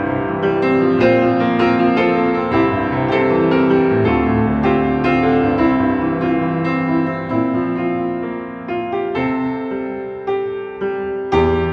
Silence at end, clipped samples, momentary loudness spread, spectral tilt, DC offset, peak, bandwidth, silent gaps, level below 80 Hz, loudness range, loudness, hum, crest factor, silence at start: 0 s; under 0.1%; 9 LU; -9 dB/octave; under 0.1%; -2 dBFS; 6.2 kHz; none; -38 dBFS; 6 LU; -17 LUFS; none; 14 dB; 0 s